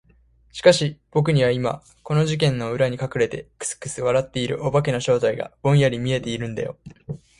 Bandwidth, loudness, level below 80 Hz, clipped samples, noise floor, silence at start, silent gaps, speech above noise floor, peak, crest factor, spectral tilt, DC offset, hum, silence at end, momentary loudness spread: 11.5 kHz; -22 LUFS; -52 dBFS; under 0.1%; -57 dBFS; 0.55 s; none; 35 dB; 0 dBFS; 22 dB; -5.5 dB/octave; under 0.1%; none; 0.25 s; 12 LU